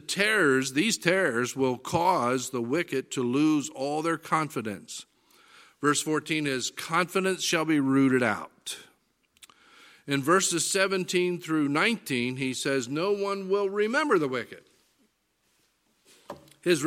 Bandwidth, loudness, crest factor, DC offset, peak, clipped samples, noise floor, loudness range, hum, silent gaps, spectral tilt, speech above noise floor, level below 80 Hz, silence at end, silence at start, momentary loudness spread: 16.5 kHz; -26 LUFS; 22 dB; under 0.1%; -4 dBFS; under 0.1%; -72 dBFS; 4 LU; none; none; -4 dB/octave; 46 dB; -70 dBFS; 0 s; 0.1 s; 12 LU